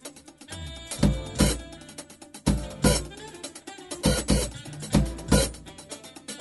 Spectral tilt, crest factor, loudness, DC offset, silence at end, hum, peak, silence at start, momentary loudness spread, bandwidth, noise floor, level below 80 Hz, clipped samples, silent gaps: -4.5 dB/octave; 22 dB; -26 LUFS; under 0.1%; 0 s; none; -6 dBFS; 0.05 s; 18 LU; 12 kHz; -46 dBFS; -34 dBFS; under 0.1%; none